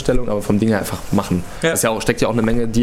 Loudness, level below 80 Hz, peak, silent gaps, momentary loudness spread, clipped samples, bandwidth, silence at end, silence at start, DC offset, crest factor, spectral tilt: -18 LUFS; -32 dBFS; 0 dBFS; none; 4 LU; under 0.1%; 16.5 kHz; 0 s; 0 s; under 0.1%; 16 dB; -5 dB/octave